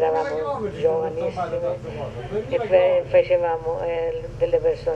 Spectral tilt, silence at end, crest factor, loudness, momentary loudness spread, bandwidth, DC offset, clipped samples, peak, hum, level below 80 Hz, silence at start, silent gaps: -7 dB/octave; 0 s; 16 dB; -23 LUFS; 10 LU; 8 kHz; under 0.1%; under 0.1%; -6 dBFS; none; -44 dBFS; 0 s; none